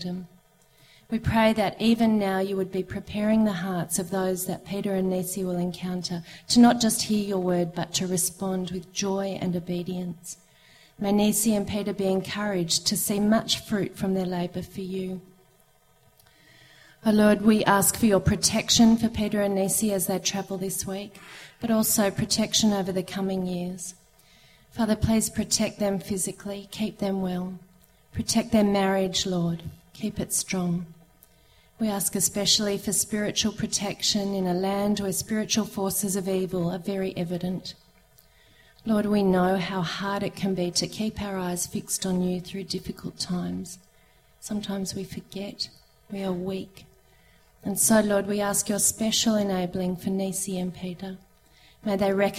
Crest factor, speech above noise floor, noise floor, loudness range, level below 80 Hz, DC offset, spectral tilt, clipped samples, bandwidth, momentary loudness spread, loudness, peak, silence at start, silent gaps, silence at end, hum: 20 dB; 35 dB; -61 dBFS; 7 LU; -52 dBFS; under 0.1%; -4 dB/octave; under 0.1%; 16 kHz; 13 LU; -25 LUFS; -6 dBFS; 0 s; none; 0 s; none